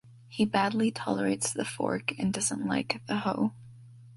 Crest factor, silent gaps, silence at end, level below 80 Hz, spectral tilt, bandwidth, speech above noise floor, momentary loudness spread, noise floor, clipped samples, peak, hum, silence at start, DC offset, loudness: 20 dB; none; 0 s; -64 dBFS; -4 dB/octave; 11.5 kHz; 21 dB; 5 LU; -50 dBFS; under 0.1%; -10 dBFS; none; 0.05 s; under 0.1%; -30 LUFS